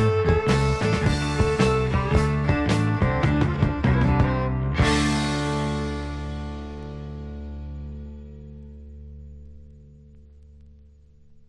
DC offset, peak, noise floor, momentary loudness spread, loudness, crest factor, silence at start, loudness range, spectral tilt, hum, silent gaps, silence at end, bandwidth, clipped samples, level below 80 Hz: under 0.1%; -6 dBFS; -51 dBFS; 22 LU; -23 LUFS; 18 dB; 0 s; 18 LU; -6.5 dB/octave; none; none; 0.8 s; 12 kHz; under 0.1%; -34 dBFS